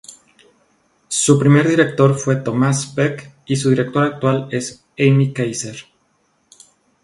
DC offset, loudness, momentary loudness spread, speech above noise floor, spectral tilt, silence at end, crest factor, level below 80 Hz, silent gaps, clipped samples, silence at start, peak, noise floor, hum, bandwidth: under 0.1%; -17 LUFS; 12 LU; 47 dB; -5.5 dB/octave; 1.2 s; 18 dB; -58 dBFS; none; under 0.1%; 0.1 s; 0 dBFS; -62 dBFS; none; 11.5 kHz